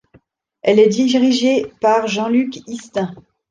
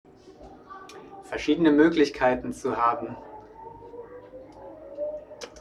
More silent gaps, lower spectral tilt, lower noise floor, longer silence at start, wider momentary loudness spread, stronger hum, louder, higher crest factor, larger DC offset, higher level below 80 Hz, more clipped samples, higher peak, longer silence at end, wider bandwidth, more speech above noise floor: neither; about the same, -5 dB/octave vs -5.5 dB/octave; first, -54 dBFS vs -48 dBFS; first, 0.65 s vs 0.25 s; second, 12 LU vs 25 LU; neither; first, -16 LUFS vs -24 LUFS; second, 14 dB vs 20 dB; neither; about the same, -60 dBFS vs -56 dBFS; neither; first, -2 dBFS vs -6 dBFS; first, 0.3 s vs 0 s; second, 9.2 kHz vs 11 kHz; first, 38 dB vs 25 dB